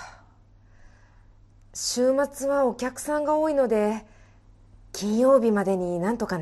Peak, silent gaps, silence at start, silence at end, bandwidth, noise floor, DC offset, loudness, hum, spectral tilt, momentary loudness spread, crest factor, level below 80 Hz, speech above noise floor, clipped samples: -8 dBFS; none; 0 s; 0 s; 12.5 kHz; -54 dBFS; under 0.1%; -24 LUFS; none; -5 dB/octave; 12 LU; 18 dB; -54 dBFS; 31 dB; under 0.1%